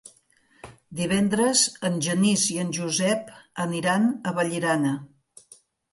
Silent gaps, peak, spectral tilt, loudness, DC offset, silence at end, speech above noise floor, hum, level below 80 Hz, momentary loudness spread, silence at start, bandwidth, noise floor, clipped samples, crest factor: none; -6 dBFS; -4 dB/octave; -24 LUFS; under 0.1%; 0.85 s; 38 dB; none; -62 dBFS; 10 LU; 0.65 s; 12 kHz; -61 dBFS; under 0.1%; 20 dB